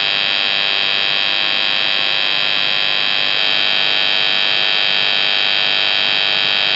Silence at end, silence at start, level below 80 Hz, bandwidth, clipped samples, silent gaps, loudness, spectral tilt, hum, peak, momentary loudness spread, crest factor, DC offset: 0 s; 0 s; under -90 dBFS; 6 kHz; under 0.1%; none; -13 LUFS; -1.5 dB/octave; none; -2 dBFS; 1 LU; 14 dB; under 0.1%